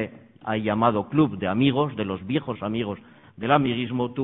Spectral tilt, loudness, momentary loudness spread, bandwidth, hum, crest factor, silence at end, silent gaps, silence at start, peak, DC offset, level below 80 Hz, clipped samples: -11 dB/octave; -24 LUFS; 11 LU; 4 kHz; none; 20 dB; 0 s; none; 0 s; -4 dBFS; under 0.1%; -58 dBFS; under 0.1%